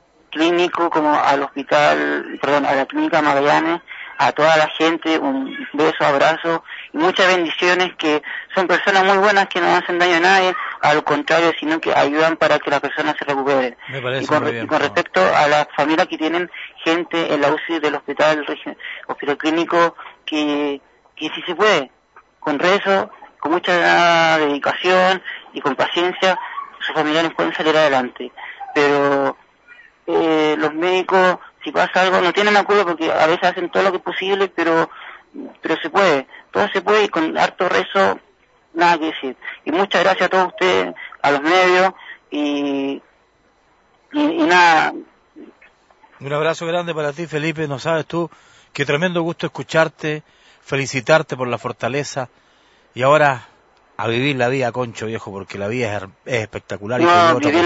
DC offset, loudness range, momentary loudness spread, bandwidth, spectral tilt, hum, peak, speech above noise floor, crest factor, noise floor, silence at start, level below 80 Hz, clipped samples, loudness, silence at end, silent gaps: under 0.1%; 5 LU; 13 LU; 8 kHz; -4.5 dB/octave; none; 0 dBFS; 40 dB; 18 dB; -57 dBFS; 0.3 s; -64 dBFS; under 0.1%; -17 LUFS; 0 s; none